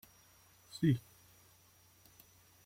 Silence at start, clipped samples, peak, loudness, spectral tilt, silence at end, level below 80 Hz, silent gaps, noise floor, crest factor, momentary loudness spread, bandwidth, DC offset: 0.75 s; under 0.1%; -20 dBFS; -35 LUFS; -7 dB/octave; 1.65 s; -70 dBFS; none; -66 dBFS; 22 dB; 27 LU; 16.5 kHz; under 0.1%